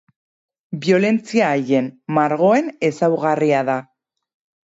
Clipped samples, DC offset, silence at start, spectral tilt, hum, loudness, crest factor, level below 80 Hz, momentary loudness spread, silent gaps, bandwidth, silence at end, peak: under 0.1%; under 0.1%; 0.7 s; -6.5 dB/octave; none; -18 LUFS; 16 dB; -68 dBFS; 7 LU; none; 8 kHz; 0.85 s; -4 dBFS